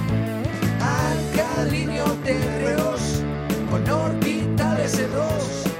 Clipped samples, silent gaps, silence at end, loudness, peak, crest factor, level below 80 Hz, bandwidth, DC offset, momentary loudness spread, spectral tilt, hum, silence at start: under 0.1%; none; 0 s; -23 LUFS; -8 dBFS; 14 dB; -38 dBFS; 17 kHz; under 0.1%; 3 LU; -6 dB/octave; none; 0 s